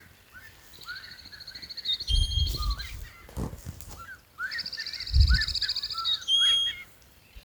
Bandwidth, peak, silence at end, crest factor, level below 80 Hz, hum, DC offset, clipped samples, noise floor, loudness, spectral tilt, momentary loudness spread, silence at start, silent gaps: over 20 kHz; -8 dBFS; 0.05 s; 20 dB; -34 dBFS; none; under 0.1%; under 0.1%; -55 dBFS; -26 LUFS; -2.5 dB/octave; 22 LU; 0.35 s; none